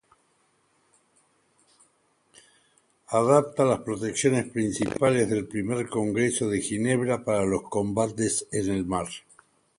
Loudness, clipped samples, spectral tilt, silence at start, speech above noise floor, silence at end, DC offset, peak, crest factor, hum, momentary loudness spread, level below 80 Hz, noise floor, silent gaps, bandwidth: -26 LUFS; under 0.1%; -5 dB/octave; 3.1 s; 43 dB; 0.6 s; under 0.1%; -6 dBFS; 22 dB; none; 7 LU; -56 dBFS; -68 dBFS; none; 11.5 kHz